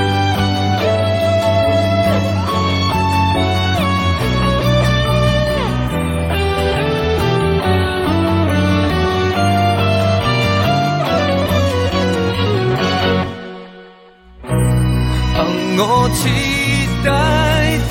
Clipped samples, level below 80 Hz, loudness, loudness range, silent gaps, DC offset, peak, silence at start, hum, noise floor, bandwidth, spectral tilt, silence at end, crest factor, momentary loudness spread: under 0.1%; -28 dBFS; -15 LUFS; 3 LU; none; under 0.1%; -2 dBFS; 0 s; none; -42 dBFS; 17 kHz; -6 dB/octave; 0 s; 12 dB; 3 LU